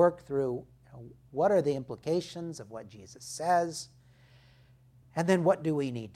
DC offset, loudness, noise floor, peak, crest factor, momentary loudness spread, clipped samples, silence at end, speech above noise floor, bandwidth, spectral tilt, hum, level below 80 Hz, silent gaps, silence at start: under 0.1%; -30 LUFS; -60 dBFS; -10 dBFS; 20 dB; 21 LU; under 0.1%; 0.05 s; 29 dB; 15 kHz; -6 dB/octave; none; -66 dBFS; none; 0 s